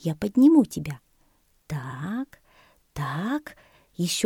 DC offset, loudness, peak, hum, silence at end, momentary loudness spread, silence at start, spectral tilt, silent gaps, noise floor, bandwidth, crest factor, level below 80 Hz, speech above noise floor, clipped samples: under 0.1%; -25 LUFS; -6 dBFS; none; 0 s; 24 LU; 0.05 s; -5.5 dB/octave; none; -64 dBFS; 17.5 kHz; 18 dB; -56 dBFS; 42 dB; under 0.1%